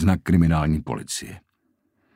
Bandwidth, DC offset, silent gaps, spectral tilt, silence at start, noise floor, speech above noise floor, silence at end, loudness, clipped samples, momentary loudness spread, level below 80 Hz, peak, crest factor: 16 kHz; under 0.1%; none; -6.5 dB/octave; 0 s; -70 dBFS; 49 dB; 0.8 s; -22 LUFS; under 0.1%; 12 LU; -36 dBFS; -4 dBFS; 18 dB